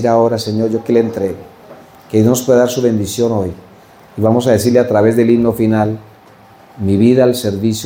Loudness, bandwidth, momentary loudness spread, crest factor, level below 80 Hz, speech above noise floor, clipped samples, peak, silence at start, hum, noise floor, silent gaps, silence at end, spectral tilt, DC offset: -13 LUFS; 17 kHz; 10 LU; 14 dB; -50 dBFS; 30 dB; under 0.1%; 0 dBFS; 0 s; none; -42 dBFS; none; 0 s; -6.5 dB/octave; under 0.1%